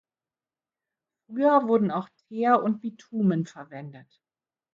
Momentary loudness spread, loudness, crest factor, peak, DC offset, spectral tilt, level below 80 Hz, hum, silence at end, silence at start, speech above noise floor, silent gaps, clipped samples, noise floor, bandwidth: 19 LU; -25 LUFS; 20 dB; -8 dBFS; under 0.1%; -8.5 dB/octave; -74 dBFS; none; 0.75 s; 1.3 s; over 65 dB; none; under 0.1%; under -90 dBFS; 7.4 kHz